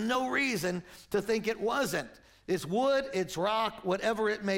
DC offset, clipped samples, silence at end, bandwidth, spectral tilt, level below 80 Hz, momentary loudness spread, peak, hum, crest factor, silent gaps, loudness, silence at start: under 0.1%; under 0.1%; 0 s; 16.5 kHz; -4.5 dB/octave; -62 dBFS; 7 LU; -16 dBFS; none; 14 dB; none; -31 LUFS; 0 s